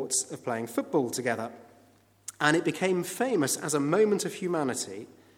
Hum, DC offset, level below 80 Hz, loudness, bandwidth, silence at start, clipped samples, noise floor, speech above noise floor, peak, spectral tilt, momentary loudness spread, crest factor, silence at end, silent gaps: none; under 0.1%; -78 dBFS; -28 LUFS; 18 kHz; 0 s; under 0.1%; -61 dBFS; 33 dB; -8 dBFS; -4 dB/octave; 11 LU; 22 dB; 0.25 s; none